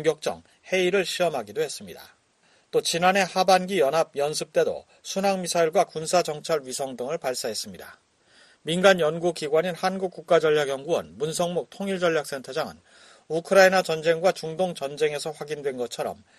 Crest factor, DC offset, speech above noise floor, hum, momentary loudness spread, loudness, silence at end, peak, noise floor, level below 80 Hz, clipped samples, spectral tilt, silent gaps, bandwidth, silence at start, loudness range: 22 dB; under 0.1%; 38 dB; none; 11 LU; -24 LUFS; 0.25 s; -4 dBFS; -63 dBFS; -68 dBFS; under 0.1%; -3.5 dB/octave; none; 13 kHz; 0 s; 3 LU